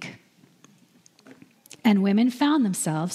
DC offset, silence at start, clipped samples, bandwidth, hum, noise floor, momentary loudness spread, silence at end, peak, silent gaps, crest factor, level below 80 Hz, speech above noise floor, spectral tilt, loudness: under 0.1%; 0 s; under 0.1%; 15 kHz; none; -58 dBFS; 6 LU; 0 s; -6 dBFS; none; 18 dB; -78 dBFS; 36 dB; -5 dB/octave; -22 LUFS